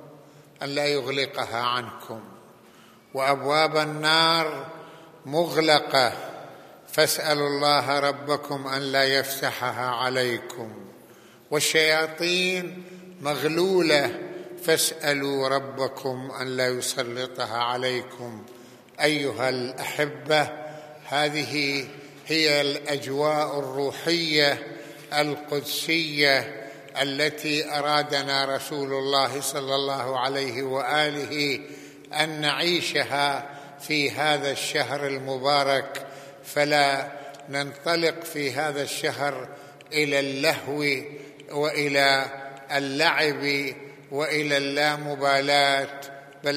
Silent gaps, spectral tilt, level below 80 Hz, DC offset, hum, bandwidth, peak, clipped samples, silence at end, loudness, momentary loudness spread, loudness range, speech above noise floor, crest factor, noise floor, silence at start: none; -3 dB/octave; -80 dBFS; under 0.1%; none; 15 kHz; -2 dBFS; under 0.1%; 0 s; -24 LUFS; 17 LU; 3 LU; 27 dB; 22 dB; -52 dBFS; 0 s